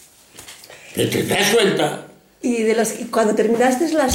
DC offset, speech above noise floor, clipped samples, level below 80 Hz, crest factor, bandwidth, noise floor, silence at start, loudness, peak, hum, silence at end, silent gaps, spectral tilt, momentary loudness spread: under 0.1%; 25 dB; under 0.1%; -56 dBFS; 14 dB; 17 kHz; -43 dBFS; 0.4 s; -18 LUFS; -4 dBFS; none; 0 s; none; -4 dB/octave; 20 LU